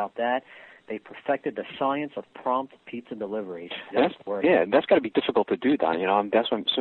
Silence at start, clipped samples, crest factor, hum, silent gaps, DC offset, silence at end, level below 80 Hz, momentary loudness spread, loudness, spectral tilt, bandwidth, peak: 0 s; under 0.1%; 18 dB; none; none; under 0.1%; 0 s; -70 dBFS; 14 LU; -26 LUFS; -7.5 dB/octave; 4.4 kHz; -8 dBFS